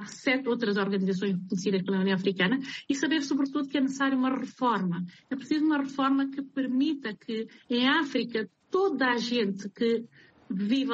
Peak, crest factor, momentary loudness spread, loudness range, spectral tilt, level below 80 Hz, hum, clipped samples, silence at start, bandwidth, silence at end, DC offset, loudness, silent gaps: -12 dBFS; 16 dB; 7 LU; 1 LU; -5.5 dB/octave; -74 dBFS; none; under 0.1%; 0 s; 8 kHz; 0 s; under 0.1%; -28 LUFS; none